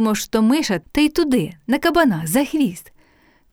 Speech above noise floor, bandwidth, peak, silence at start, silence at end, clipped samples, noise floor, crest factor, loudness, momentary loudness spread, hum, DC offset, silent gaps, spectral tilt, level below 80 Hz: 37 dB; over 20 kHz; -4 dBFS; 0 s; 0.7 s; under 0.1%; -56 dBFS; 16 dB; -18 LUFS; 5 LU; none; under 0.1%; none; -4.5 dB/octave; -44 dBFS